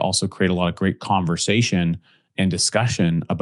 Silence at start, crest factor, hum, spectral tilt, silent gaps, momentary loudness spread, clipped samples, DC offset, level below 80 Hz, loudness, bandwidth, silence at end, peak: 0 s; 16 dB; none; -4.5 dB/octave; none; 6 LU; under 0.1%; under 0.1%; -54 dBFS; -20 LUFS; 12 kHz; 0 s; -4 dBFS